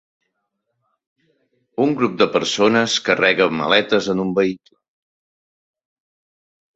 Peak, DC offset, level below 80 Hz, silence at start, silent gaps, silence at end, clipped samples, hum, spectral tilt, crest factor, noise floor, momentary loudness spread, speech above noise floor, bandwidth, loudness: 0 dBFS; under 0.1%; -62 dBFS; 1.8 s; none; 2.2 s; under 0.1%; none; -4 dB/octave; 20 dB; -75 dBFS; 6 LU; 57 dB; 8.2 kHz; -17 LUFS